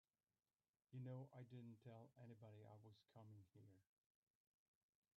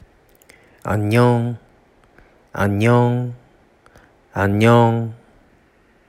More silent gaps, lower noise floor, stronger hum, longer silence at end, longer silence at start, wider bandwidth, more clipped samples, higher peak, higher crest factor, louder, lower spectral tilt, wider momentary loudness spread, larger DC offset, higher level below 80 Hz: neither; first, under -90 dBFS vs -55 dBFS; neither; first, 1.35 s vs 0.95 s; about the same, 0.9 s vs 0.85 s; second, 4.9 kHz vs 14.5 kHz; neither; second, -46 dBFS vs -2 dBFS; about the same, 18 dB vs 18 dB; second, -62 LUFS vs -17 LUFS; about the same, -8.5 dB/octave vs -7.5 dB/octave; second, 11 LU vs 17 LU; neither; second, under -90 dBFS vs -54 dBFS